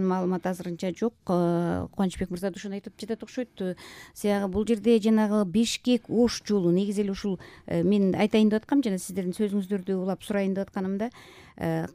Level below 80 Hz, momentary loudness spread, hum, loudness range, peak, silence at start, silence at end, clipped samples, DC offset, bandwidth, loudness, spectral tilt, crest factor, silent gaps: -54 dBFS; 11 LU; none; 5 LU; -10 dBFS; 0 s; 0.05 s; under 0.1%; under 0.1%; 15.5 kHz; -27 LUFS; -6.5 dB/octave; 16 dB; none